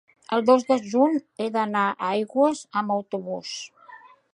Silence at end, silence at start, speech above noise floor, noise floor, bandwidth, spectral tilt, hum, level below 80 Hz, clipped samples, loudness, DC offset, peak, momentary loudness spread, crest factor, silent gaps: 0.4 s; 0.3 s; 26 dB; -49 dBFS; 11 kHz; -5 dB/octave; none; -74 dBFS; under 0.1%; -24 LUFS; under 0.1%; -4 dBFS; 12 LU; 20 dB; none